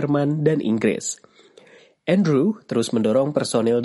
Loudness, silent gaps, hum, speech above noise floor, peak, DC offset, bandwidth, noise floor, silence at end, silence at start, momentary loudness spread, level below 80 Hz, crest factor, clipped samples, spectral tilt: -21 LUFS; none; none; 31 dB; -4 dBFS; under 0.1%; 11.5 kHz; -50 dBFS; 0 s; 0 s; 8 LU; -64 dBFS; 16 dB; under 0.1%; -6 dB/octave